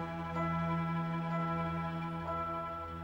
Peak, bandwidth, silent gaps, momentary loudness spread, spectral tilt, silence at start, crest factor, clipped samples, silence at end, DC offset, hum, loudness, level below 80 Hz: -24 dBFS; 6 kHz; none; 4 LU; -8.5 dB/octave; 0 s; 12 dB; under 0.1%; 0 s; under 0.1%; none; -36 LUFS; -60 dBFS